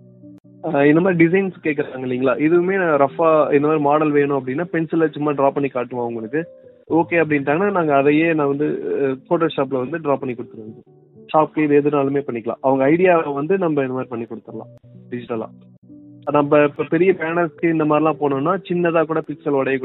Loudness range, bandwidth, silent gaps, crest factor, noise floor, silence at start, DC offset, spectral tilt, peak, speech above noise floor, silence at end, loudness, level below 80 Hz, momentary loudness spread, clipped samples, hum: 4 LU; 4.1 kHz; 15.78-15.82 s; 18 dB; -43 dBFS; 0.25 s; under 0.1%; -11.5 dB/octave; -2 dBFS; 25 dB; 0 s; -18 LUFS; -66 dBFS; 12 LU; under 0.1%; none